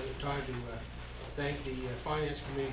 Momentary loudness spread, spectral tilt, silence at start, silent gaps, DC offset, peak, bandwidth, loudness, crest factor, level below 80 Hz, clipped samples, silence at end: 9 LU; -4.5 dB/octave; 0 s; none; under 0.1%; -24 dBFS; 4 kHz; -38 LUFS; 14 dB; -46 dBFS; under 0.1%; 0 s